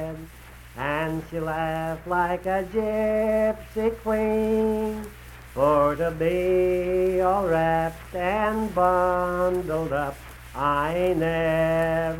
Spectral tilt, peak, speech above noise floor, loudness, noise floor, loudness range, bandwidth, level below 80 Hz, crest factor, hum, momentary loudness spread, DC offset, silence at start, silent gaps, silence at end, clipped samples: -7 dB/octave; -8 dBFS; 21 dB; -24 LUFS; -45 dBFS; 3 LU; 17 kHz; -42 dBFS; 16 dB; none; 9 LU; under 0.1%; 0 s; none; 0 s; under 0.1%